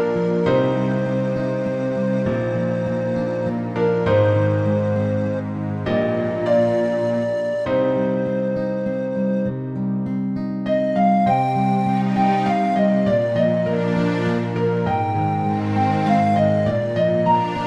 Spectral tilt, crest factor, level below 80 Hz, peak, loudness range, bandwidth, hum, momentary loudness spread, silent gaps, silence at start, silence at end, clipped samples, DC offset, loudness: -8.5 dB/octave; 14 dB; -50 dBFS; -6 dBFS; 3 LU; 9 kHz; none; 6 LU; none; 0 s; 0 s; under 0.1%; under 0.1%; -20 LUFS